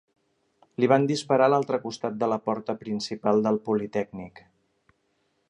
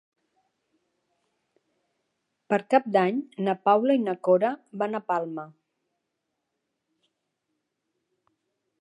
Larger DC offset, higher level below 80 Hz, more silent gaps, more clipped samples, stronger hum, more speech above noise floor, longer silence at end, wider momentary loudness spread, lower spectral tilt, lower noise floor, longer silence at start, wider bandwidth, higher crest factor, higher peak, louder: neither; first, -68 dBFS vs -84 dBFS; neither; neither; neither; second, 47 dB vs 57 dB; second, 1.1 s vs 3.3 s; first, 12 LU vs 9 LU; second, -6 dB/octave vs -7.5 dB/octave; second, -72 dBFS vs -81 dBFS; second, 0.8 s vs 2.5 s; about the same, 10.5 kHz vs 10.5 kHz; about the same, 22 dB vs 22 dB; about the same, -6 dBFS vs -6 dBFS; about the same, -25 LUFS vs -25 LUFS